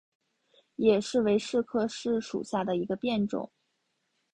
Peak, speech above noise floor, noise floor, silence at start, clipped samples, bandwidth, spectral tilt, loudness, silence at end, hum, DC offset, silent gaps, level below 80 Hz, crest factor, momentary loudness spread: -10 dBFS; 50 dB; -78 dBFS; 0.8 s; under 0.1%; 10 kHz; -5.5 dB/octave; -29 LUFS; 0.9 s; none; under 0.1%; none; -66 dBFS; 20 dB; 7 LU